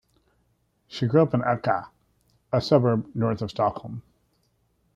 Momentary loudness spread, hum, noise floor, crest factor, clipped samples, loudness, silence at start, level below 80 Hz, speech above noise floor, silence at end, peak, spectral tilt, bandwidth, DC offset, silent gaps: 17 LU; none; -69 dBFS; 22 dB; under 0.1%; -24 LUFS; 0.9 s; -60 dBFS; 46 dB; 0.95 s; -4 dBFS; -8 dB/octave; 7.6 kHz; under 0.1%; none